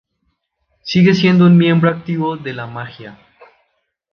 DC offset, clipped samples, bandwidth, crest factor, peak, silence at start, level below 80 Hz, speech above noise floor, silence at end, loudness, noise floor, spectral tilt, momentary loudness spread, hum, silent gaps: under 0.1%; under 0.1%; 6.6 kHz; 14 dB; -2 dBFS; 0.85 s; -56 dBFS; 55 dB; 1 s; -13 LUFS; -68 dBFS; -7.5 dB/octave; 20 LU; none; none